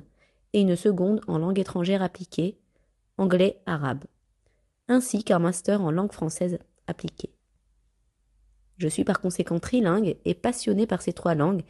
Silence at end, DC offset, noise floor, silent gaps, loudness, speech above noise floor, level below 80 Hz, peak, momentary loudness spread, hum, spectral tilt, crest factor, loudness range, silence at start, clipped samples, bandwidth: 0.1 s; under 0.1%; -69 dBFS; none; -26 LUFS; 44 dB; -58 dBFS; -10 dBFS; 12 LU; none; -6 dB/octave; 16 dB; 6 LU; 0.55 s; under 0.1%; 12.5 kHz